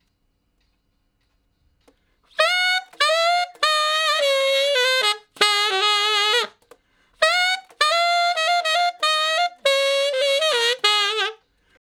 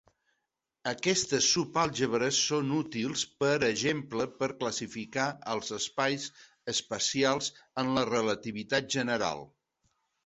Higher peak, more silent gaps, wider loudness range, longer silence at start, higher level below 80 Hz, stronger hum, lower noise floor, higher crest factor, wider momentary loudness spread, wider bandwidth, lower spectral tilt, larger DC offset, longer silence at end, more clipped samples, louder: first, 0 dBFS vs -12 dBFS; neither; about the same, 3 LU vs 4 LU; first, 2.4 s vs 0.85 s; second, -72 dBFS vs -66 dBFS; neither; second, -68 dBFS vs -84 dBFS; about the same, 22 dB vs 20 dB; second, 4 LU vs 9 LU; first, 18.5 kHz vs 8.4 kHz; second, 2.5 dB/octave vs -3 dB/octave; neither; second, 0.65 s vs 0.8 s; neither; first, -19 LUFS vs -30 LUFS